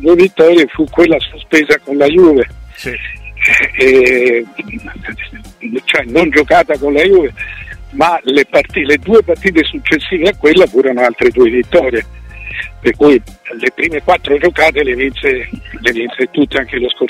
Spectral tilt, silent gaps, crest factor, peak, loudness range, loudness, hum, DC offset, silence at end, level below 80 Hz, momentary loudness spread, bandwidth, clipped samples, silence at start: -5 dB/octave; none; 12 dB; 0 dBFS; 2 LU; -11 LUFS; none; under 0.1%; 0 s; -34 dBFS; 16 LU; 13.5 kHz; under 0.1%; 0 s